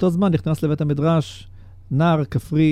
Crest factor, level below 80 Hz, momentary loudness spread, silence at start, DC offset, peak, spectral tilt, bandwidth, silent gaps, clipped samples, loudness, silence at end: 14 dB; -44 dBFS; 7 LU; 0 s; under 0.1%; -4 dBFS; -8 dB/octave; 13.5 kHz; none; under 0.1%; -20 LUFS; 0 s